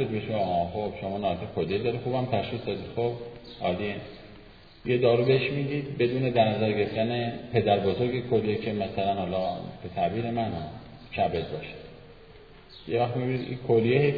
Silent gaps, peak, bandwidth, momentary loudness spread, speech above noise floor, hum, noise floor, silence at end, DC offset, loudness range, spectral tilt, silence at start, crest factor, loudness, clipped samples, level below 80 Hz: none; -8 dBFS; 5 kHz; 14 LU; 24 dB; none; -51 dBFS; 0 s; 0.1%; 6 LU; -9.5 dB/octave; 0 s; 20 dB; -28 LUFS; under 0.1%; -54 dBFS